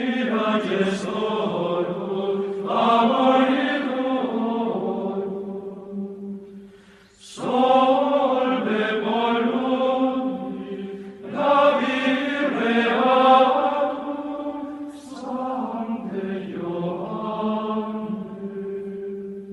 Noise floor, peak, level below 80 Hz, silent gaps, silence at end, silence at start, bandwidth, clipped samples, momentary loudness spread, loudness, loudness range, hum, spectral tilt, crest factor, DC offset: -50 dBFS; -4 dBFS; -66 dBFS; none; 0 s; 0 s; 11 kHz; under 0.1%; 15 LU; -22 LUFS; 9 LU; none; -6 dB/octave; 18 dB; under 0.1%